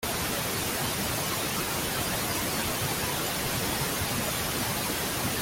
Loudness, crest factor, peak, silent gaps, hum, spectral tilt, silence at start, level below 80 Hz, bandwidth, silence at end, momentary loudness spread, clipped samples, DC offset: -28 LUFS; 16 dB; -14 dBFS; none; none; -2.5 dB/octave; 0 s; -48 dBFS; 17 kHz; 0 s; 1 LU; under 0.1%; under 0.1%